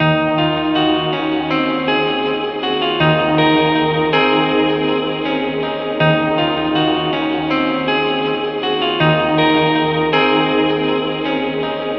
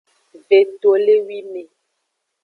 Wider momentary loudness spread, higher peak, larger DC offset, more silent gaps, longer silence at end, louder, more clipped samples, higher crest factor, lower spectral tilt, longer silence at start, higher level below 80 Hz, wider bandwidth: second, 6 LU vs 18 LU; about the same, 0 dBFS vs -2 dBFS; neither; neither; second, 0 s vs 0.8 s; about the same, -16 LUFS vs -15 LUFS; neither; about the same, 16 dB vs 16 dB; first, -8 dB/octave vs -5.5 dB/octave; second, 0 s vs 0.5 s; first, -46 dBFS vs -78 dBFS; first, 6 kHz vs 4.5 kHz